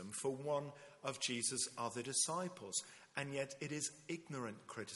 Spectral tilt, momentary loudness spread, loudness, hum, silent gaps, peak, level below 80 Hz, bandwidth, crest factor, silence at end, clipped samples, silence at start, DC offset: -2.5 dB/octave; 11 LU; -42 LUFS; none; none; -22 dBFS; -84 dBFS; 11.5 kHz; 20 dB; 0 s; under 0.1%; 0 s; under 0.1%